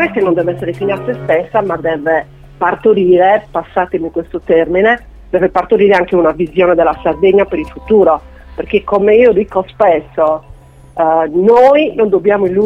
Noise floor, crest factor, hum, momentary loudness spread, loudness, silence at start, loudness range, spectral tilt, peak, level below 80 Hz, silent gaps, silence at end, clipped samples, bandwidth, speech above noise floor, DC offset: -37 dBFS; 12 dB; none; 9 LU; -12 LUFS; 0 s; 2 LU; -8 dB/octave; 0 dBFS; -38 dBFS; none; 0 s; under 0.1%; 6 kHz; 26 dB; under 0.1%